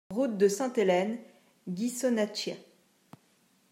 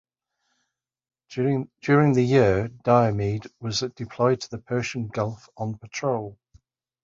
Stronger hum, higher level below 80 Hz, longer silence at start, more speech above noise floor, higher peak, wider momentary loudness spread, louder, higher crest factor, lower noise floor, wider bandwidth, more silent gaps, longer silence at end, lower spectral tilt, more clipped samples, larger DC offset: neither; second, -80 dBFS vs -52 dBFS; second, 0.1 s vs 1.3 s; second, 39 dB vs 55 dB; second, -14 dBFS vs -4 dBFS; about the same, 15 LU vs 13 LU; second, -29 LUFS vs -24 LUFS; about the same, 18 dB vs 20 dB; second, -67 dBFS vs -78 dBFS; first, 16 kHz vs 7.6 kHz; neither; first, 1.1 s vs 0.7 s; second, -4.5 dB/octave vs -6.5 dB/octave; neither; neither